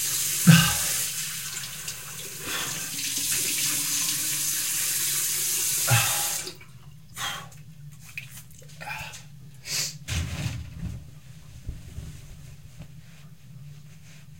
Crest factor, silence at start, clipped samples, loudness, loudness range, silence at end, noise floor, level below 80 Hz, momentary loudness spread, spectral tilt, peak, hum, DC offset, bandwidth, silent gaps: 26 dB; 0 s; under 0.1%; -24 LUFS; 15 LU; 0 s; -48 dBFS; -50 dBFS; 25 LU; -2.5 dB/octave; -2 dBFS; none; 0.4%; 16.5 kHz; none